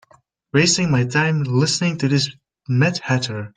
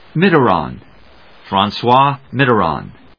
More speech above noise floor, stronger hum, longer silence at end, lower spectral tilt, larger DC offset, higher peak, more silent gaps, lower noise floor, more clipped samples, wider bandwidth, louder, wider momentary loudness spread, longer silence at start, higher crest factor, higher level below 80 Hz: first, 37 dB vs 31 dB; neither; second, 0.1 s vs 0.25 s; second, -4.5 dB/octave vs -8 dB/octave; second, under 0.1% vs 0.3%; about the same, -2 dBFS vs 0 dBFS; neither; first, -56 dBFS vs -45 dBFS; neither; first, 9.6 kHz vs 5.4 kHz; second, -19 LUFS vs -14 LUFS; about the same, 6 LU vs 8 LU; first, 0.55 s vs 0.15 s; about the same, 16 dB vs 16 dB; second, -56 dBFS vs -46 dBFS